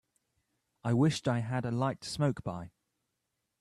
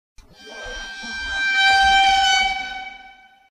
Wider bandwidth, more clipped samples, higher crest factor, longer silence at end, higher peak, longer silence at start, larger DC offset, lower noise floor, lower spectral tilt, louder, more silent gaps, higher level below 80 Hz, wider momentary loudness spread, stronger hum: about the same, 12.5 kHz vs 13.5 kHz; neither; about the same, 18 dB vs 16 dB; first, 0.95 s vs 0.4 s; second, -16 dBFS vs -6 dBFS; first, 0.85 s vs 0.4 s; neither; first, -84 dBFS vs -47 dBFS; first, -6.5 dB/octave vs 0.5 dB/octave; second, -32 LUFS vs -16 LUFS; neither; second, -64 dBFS vs -42 dBFS; second, 13 LU vs 19 LU; neither